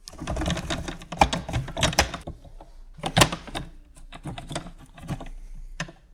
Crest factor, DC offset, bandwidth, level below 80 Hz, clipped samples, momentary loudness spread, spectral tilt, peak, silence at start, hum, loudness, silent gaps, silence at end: 24 dB; under 0.1%; 19 kHz; -38 dBFS; under 0.1%; 23 LU; -3.5 dB/octave; -4 dBFS; 0.05 s; none; -27 LUFS; none; 0 s